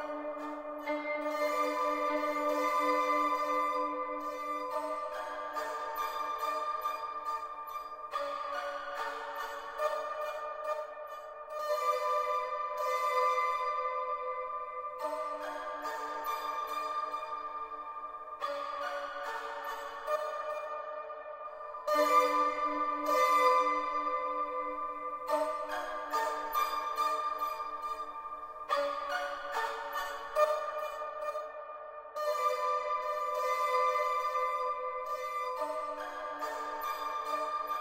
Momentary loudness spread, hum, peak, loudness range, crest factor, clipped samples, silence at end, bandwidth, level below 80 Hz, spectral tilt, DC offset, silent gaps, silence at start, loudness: 11 LU; none; -14 dBFS; 7 LU; 20 dB; under 0.1%; 0 s; 16 kHz; -70 dBFS; -1.5 dB/octave; under 0.1%; none; 0 s; -34 LUFS